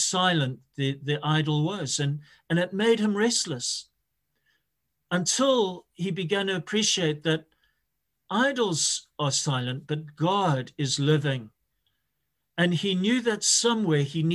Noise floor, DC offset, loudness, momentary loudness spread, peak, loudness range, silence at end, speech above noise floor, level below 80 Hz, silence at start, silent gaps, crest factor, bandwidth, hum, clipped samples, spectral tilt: -80 dBFS; under 0.1%; -25 LUFS; 8 LU; -10 dBFS; 2 LU; 0 s; 54 dB; -68 dBFS; 0 s; none; 18 dB; 12.5 kHz; none; under 0.1%; -4 dB/octave